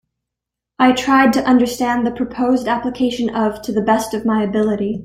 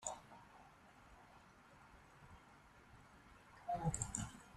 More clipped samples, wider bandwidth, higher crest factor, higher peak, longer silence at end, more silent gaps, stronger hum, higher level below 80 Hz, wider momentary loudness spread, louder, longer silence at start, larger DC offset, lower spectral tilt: neither; first, 16 kHz vs 13 kHz; second, 16 dB vs 28 dB; first, -2 dBFS vs -24 dBFS; about the same, 0 s vs 0 s; neither; neither; first, -48 dBFS vs -64 dBFS; second, 7 LU vs 22 LU; first, -17 LUFS vs -45 LUFS; first, 0.8 s vs 0 s; neither; about the same, -5 dB/octave vs -4.5 dB/octave